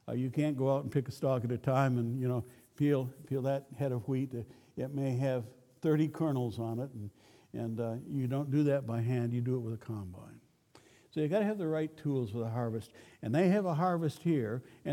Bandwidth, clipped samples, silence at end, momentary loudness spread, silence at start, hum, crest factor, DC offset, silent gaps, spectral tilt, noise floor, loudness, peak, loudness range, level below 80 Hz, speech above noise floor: 16.5 kHz; under 0.1%; 0 s; 12 LU; 0.05 s; none; 18 dB; under 0.1%; none; -8.5 dB/octave; -63 dBFS; -34 LUFS; -16 dBFS; 3 LU; -72 dBFS; 30 dB